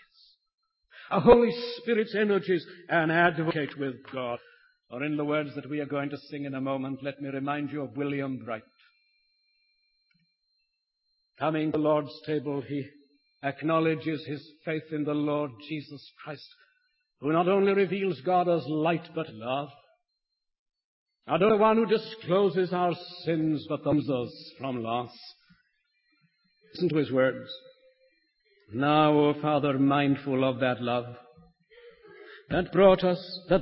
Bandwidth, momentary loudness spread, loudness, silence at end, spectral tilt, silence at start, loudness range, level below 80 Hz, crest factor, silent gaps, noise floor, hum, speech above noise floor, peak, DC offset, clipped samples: 5.8 kHz; 16 LU; -27 LUFS; 0 s; -10.5 dB/octave; 0.95 s; 8 LU; -58 dBFS; 24 dB; 20.59-20.66 s, 20.84-21.06 s; -83 dBFS; none; 56 dB; -4 dBFS; under 0.1%; under 0.1%